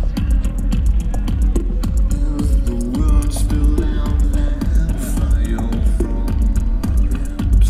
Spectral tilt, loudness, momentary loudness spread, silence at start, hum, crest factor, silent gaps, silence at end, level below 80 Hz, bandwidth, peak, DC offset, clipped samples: -7 dB/octave; -19 LUFS; 3 LU; 0 s; none; 12 dB; none; 0 s; -16 dBFS; 13 kHz; -4 dBFS; under 0.1%; under 0.1%